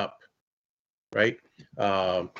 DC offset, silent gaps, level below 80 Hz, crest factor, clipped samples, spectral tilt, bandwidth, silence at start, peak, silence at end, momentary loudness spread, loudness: under 0.1%; 0.41-1.07 s; -70 dBFS; 20 dB; under 0.1%; -5.5 dB/octave; 7.6 kHz; 0 s; -10 dBFS; 0 s; 18 LU; -27 LUFS